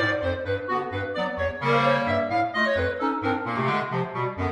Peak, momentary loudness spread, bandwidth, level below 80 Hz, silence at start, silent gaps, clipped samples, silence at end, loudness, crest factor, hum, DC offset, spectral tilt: -10 dBFS; 6 LU; 11.5 kHz; -50 dBFS; 0 s; none; under 0.1%; 0 s; -25 LUFS; 14 dB; none; under 0.1%; -6.5 dB/octave